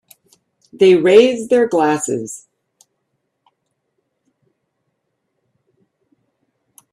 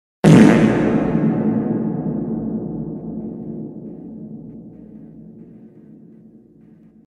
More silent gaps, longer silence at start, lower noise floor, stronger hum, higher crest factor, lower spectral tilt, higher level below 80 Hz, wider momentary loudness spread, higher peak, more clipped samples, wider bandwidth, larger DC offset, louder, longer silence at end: neither; first, 0.8 s vs 0.25 s; first, -72 dBFS vs -47 dBFS; neither; about the same, 18 dB vs 20 dB; second, -4.5 dB/octave vs -7.5 dB/octave; second, -66 dBFS vs -46 dBFS; second, 16 LU vs 27 LU; about the same, 0 dBFS vs 0 dBFS; neither; first, 13 kHz vs 11.5 kHz; neither; first, -13 LUFS vs -17 LUFS; first, 4.55 s vs 1.6 s